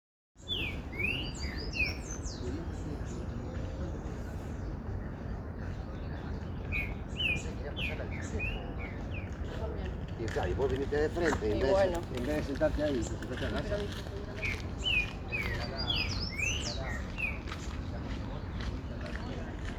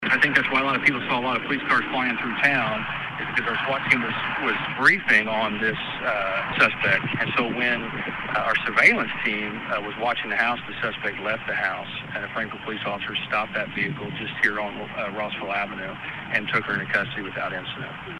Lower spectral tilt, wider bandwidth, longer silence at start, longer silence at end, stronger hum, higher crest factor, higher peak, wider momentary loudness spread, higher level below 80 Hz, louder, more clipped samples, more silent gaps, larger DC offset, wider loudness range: about the same, -5 dB/octave vs -5 dB/octave; first, 19 kHz vs 12 kHz; first, 0.35 s vs 0 s; about the same, 0 s vs 0 s; neither; about the same, 20 dB vs 22 dB; second, -14 dBFS vs -2 dBFS; about the same, 10 LU vs 11 LU; first, -42 dBFS vs -56 dBFS; second, -35 LUFS vs -23 LUFS; neither; neither; neither; about the same, 8 LU vs 6 LU